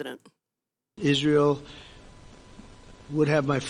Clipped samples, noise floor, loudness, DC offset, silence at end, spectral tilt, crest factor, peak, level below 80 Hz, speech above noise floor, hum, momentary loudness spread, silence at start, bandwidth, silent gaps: under 0.1%; -88 dBFS; -24 LUFS; under 0.1%; 0 s; -6 dB/octave; 18 dB; -10 dBFS; -54 dBFS; 63 dB; none; 24 LU; 0 s; 11.5 kHz; none